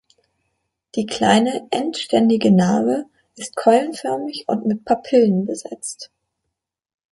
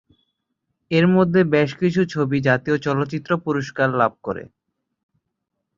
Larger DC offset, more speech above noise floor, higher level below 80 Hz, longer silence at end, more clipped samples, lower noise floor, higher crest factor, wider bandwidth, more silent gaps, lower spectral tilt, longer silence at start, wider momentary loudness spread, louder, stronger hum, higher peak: neither; about the same, 61 dB vs 59 dB; about the same, -62 dBFS vs -58 dBFS; second, 1.1 s vs 1.3 s; neither; about the same, -80 dBFS vs -78 dBFS; about the same, 18 dB vs 18 dB; first, 11.5 kHz vs 7.4 kHz; neither; second, -5.5 dB/octave vs -7.5 dB/octave; about the same, 0.95 s vs 0.9 s; first, 14 LU vs 8 LU; about the same, -19 LUFS vs -20 LUFS; neither; about the same, -2 dBFS vs -2 dBFS